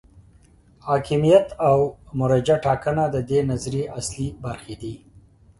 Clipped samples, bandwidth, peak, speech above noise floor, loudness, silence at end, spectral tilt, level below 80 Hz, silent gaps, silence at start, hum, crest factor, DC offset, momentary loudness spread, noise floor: under 0.1%; 11.5 kHz; -2 dBFS; 32 dB; -21 LUFS; 0.4 s; -6.5 dB/octave; -46 dBFS; none; 0.85 s; none; 20 dB; under 0.1%; 17 LU; -53 dBFS